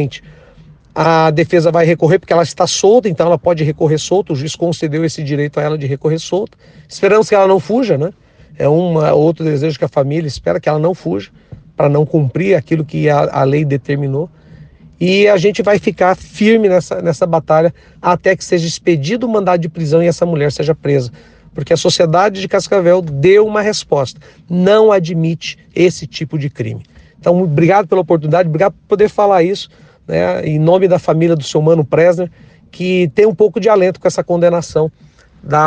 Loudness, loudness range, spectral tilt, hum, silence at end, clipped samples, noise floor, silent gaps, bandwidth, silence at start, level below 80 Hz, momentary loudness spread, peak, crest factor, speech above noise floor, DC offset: -13 LUFS; 3 LU; -6 dB/octave; none; 0 s; under 0.1%; -42 dBFS; none; 9.8 kHz; 0 s; -48 dBFS; 9 LU; 0 dBFS; 12 dB; 29 dB; under 0.1%